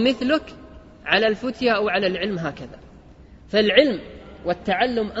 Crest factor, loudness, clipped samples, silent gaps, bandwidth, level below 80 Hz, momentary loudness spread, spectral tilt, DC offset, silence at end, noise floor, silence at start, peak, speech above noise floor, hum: 22 dB; -21 LUFS; under 0.1%; none; 8 kHz; -48 dBFS; 18 LU; -5.5 dB/octave; under 0.1%; 0 s; -46 dBFS; 0 s; -2 dBFS; 25 dB; none